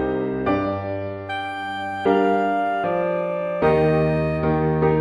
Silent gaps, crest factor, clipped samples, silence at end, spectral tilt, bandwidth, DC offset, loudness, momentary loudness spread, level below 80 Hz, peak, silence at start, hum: none; 16 dB; under 0.1%; 0 s; -8.5 dB/octave; 9.2 kHz; under 0.1%; -22 LUFS; 9 LU; -42 dBFS; -6 dBFS; 0 s; none